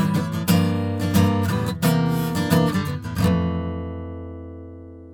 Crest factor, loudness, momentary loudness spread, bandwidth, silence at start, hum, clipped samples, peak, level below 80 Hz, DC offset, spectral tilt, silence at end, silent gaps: 16 dB; -22 LUFS; 17 LU; over 20 kHz; 0 s; none; under 0.1%; -6 dBFS; -48 dBFS; under 0.1%; -6.5 dB/octave; 0 s; none